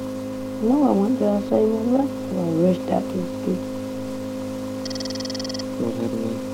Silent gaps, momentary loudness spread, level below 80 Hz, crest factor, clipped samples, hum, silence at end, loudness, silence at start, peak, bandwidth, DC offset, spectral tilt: none; 10 LU; -56 dBFS; 18 dB; under 0.1%; none; 0 s; -23 LUFS; 0 s; -6 dBFS; 16.5 kHz; under 0.1%; -6.5 dB/octave